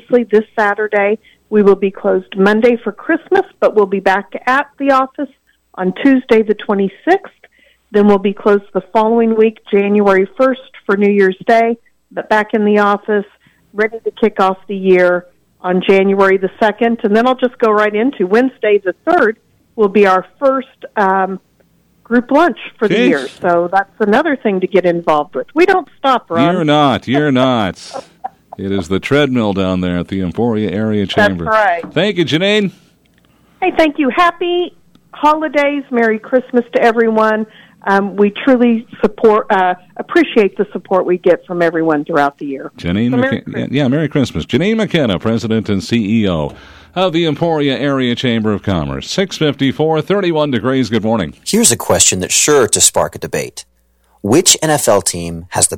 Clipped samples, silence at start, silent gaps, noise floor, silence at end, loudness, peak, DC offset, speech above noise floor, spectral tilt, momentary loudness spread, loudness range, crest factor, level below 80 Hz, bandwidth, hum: under 0.1%; 0.1 s; none; -55 dBFS; 0 s; -13 LUFS; 0 dBFS; under 0.1%; 42 dB; -4 dB/octave; 9 LU; 3 LU; 14 dB; -46 dBFS; over 20 kHz; none